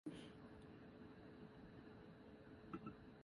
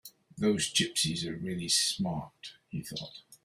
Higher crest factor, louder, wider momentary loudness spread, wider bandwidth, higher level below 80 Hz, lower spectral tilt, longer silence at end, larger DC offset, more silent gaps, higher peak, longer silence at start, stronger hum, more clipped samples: about the same, 20 dB vs 20 dB; second, -60 LUFS vs -30 LUFS; second, 7 LU vs 19 LU; second, 11 kHz vs 16 kHz; second, -74 dBFS vs -64 dBFS; first, -7 dB/octave vs -3 dB/octave; about the same, 0 s vs 0.1 s; neither; neither; second, -38 dBFS vs -14 dBFS; about the same, 0.05 s vs 0.05 s; neither; neither